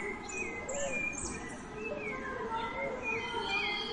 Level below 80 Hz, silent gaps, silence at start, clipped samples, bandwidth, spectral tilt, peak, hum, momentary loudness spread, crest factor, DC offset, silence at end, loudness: -54 dBFS; none; 0 s; under 0.1%; 11 kHz; -2.5 dB/octave; -22 dBFS; none; 8 LU; 14 dB; under 0.1%; 0 s; -36 LUFS